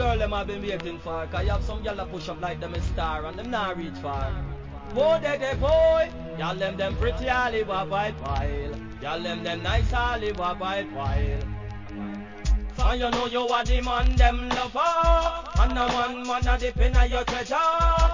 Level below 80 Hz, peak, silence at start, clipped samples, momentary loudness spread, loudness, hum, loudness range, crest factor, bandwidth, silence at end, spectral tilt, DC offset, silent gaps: -28 dBFS; -6 dBFS; 0 s; under 0.1%; 11 LU; -26 LUFS; none; 6 LU; 18 dB; 7.6 kHz; 0 s; -5.5 dB/octave; 0.2%; none